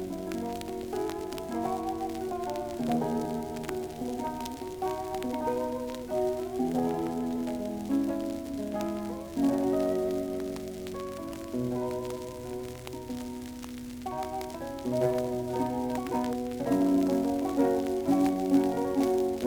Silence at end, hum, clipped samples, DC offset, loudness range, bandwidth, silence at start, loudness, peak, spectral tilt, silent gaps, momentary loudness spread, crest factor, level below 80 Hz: 0 s; none; under 0.1%; under 0.1%; 8 LU; over 20 kHz; 0 s; -31 LUFS; -14 dBFS; -6.5 dB/octave; none; 11 LU; 18 dB; -54 dBFS